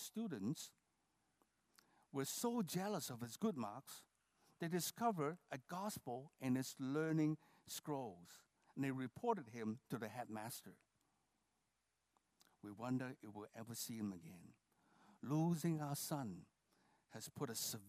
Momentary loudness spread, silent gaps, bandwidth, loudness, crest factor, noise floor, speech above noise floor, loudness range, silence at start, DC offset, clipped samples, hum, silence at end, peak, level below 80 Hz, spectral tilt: 16 LU; none; 15.5 kHz; -45 LUFS; 20 dB; -87 dBFS; 43 dB; 8 LU; 0 s; under 0.1%; under 0.1%; none; 0 s; -26 dBFS; -88 dBFS; -5 dB/octave